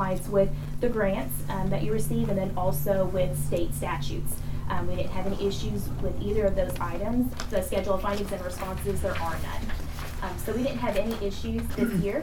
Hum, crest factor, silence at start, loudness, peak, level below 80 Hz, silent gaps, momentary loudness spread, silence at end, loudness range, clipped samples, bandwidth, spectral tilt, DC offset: none; 16 dB; 0 s; -29 LUFS; -10 dBFS; -36 dBFS; none; 7 LU; 0 s; 3 LU; under 0.1%; 18.5 kHz; -6 dB/octave; under 0.1%